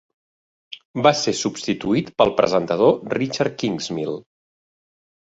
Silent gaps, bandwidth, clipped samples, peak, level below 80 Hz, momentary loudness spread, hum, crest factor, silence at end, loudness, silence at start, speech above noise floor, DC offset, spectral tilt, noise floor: 0.85-0.94 s; 8 kHz; under 0.1%; -2 dBFS; -56 dBFS; 13 LU; none; 20 dB; 1 s; -20 LUFS; 0.7 s; over 70 dB; under 0.1%; -4.5 dB/octave; under -90 dBFS